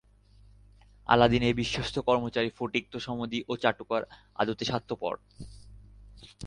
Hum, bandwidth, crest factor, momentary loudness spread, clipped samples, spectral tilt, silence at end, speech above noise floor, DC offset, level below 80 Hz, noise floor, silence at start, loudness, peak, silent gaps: 50 Hz at -55 dBFS; 10.5 kHz; 24 dB; 18 LU; under 0.1%; -5.5 dB/octave; 0 s; 29 dB; under 0.1%; -52 dBFS; -58 dBFS; 1.1 s; -29 LUFS; -6 dBFS; none